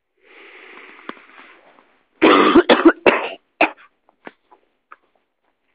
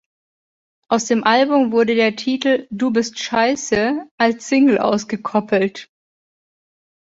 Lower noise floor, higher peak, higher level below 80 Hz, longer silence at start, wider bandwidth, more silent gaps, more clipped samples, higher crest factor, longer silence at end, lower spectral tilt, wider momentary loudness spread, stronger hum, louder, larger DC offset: second, -69 dBFS vs under -90 dBFS; about the same, 0 dBFS vs -2 dBFS; about the same, -54 dBFS vs -58 dBFS; first, 2.2 s vs 0.9 s; second, 5 kHz vs 7.8 kHz; second, none vs 4.11-4.18 s; neither; about the same, 20 dB vs 18 dB; first, 2 s vs 1.25 s; first, -8 dB/octave vs -4 dB/octave; first, 25 LU vs 7 LU; neither; first, -14 LUFS vs -18 LUFS; neither